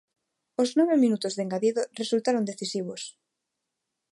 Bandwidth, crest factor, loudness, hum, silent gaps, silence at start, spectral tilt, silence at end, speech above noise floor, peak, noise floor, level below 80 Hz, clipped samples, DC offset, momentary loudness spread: 11.5 kHz; 16 dB; -26 LUFS; none; none; 0.6 s; -5 dB/octave; 1.05 s; 58 dB; -12 dBFS; -83 dBFS; -82 dBFS; under 0.1%; under 0.1%; 14 LU